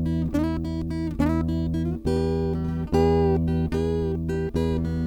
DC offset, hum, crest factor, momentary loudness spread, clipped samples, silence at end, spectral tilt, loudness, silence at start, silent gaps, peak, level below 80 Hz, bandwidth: under 0.1%; none; 16 dB; 6 LU; under 0.1%; 0 s; -8.5 dB/octave; -25 LUFS; 0 s; none; -8 dBFS; -34 dBFS; 11 kHz